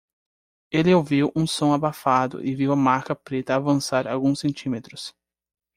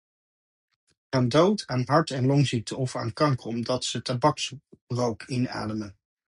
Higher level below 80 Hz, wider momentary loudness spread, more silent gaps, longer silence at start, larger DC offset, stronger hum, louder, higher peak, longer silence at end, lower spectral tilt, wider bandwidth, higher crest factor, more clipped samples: about the same, -58 dBFS vs -58 dBFS; about the same, 11 LU vs 10 LU; second, none vs 4.81-4.87 s; second, 0.7 s vs 1.1 s; neither; neither; first, -22 LUFS vs -26 LUFS; about the same, -6 dBFS vs -6 dBFS; first, 0.65 s vs 0.4 s; about the same, -6 dB/octave vs -5.5 dB/octave; first, 15.5 kHz vs 11.5 kHz; about the same, 18 dB vs 20 dB; neither